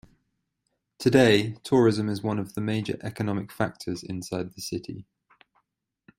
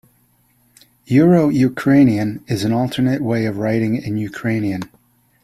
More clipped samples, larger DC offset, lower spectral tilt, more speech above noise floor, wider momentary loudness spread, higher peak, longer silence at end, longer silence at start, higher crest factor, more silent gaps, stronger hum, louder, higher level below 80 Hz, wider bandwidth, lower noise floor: neither; neither; second, -6 dB/octave vs -7.5 dB/octave; first, 53 dB vs 42 dB; first, 14 LU vs 10 LU; about the same, -4 dBFS vs -2 dBFS; first, 1.15 s vs 0.55 s; about the same, 1 s vs 1.1 s; first, 22 dB vs 16 dB; neither; neither; second, -26 LUFS vs -17 LUFS; second, -60 dBFS vs -52 dBFS; first, 16 kHz vs 14 kHz; first, -79 dBFS vs -58 dBFS